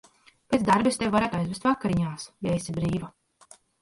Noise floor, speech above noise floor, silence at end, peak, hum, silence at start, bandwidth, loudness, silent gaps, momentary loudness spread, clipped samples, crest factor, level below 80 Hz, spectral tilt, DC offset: -56 dBFS; 30 dB; 0.7 s; -8 dBFS; none; 0.5 s; 11.5 kHz; -26 LUFS; none; 10 LU; under 0.1%; 18 dB; -52 dBFS; -6 dB/octave; under 0.1%